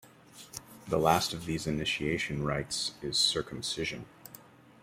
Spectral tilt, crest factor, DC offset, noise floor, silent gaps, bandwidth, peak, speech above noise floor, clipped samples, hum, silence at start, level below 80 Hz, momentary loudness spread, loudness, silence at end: -3.5 dB/octave; 24 dB; under 0.1%; -54 dBFS; none; 16 kHz; -10 dBFS; 23 dB; under 0.1%; none; 0.05 s; -56 dBFS; 18 LU; -30 LUFS; 0.4 s